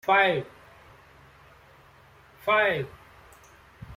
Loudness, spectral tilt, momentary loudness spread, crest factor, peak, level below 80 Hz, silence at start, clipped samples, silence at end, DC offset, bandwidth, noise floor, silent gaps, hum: -24 LUFS; -5.5 dB/octave; 22 LU; 22 dB; -8 dBFS; -60 dBFS; 0.05 s; under 0.1%; 0 s; under 0.1%; 16.5 kHz; -55 dBFS; none; none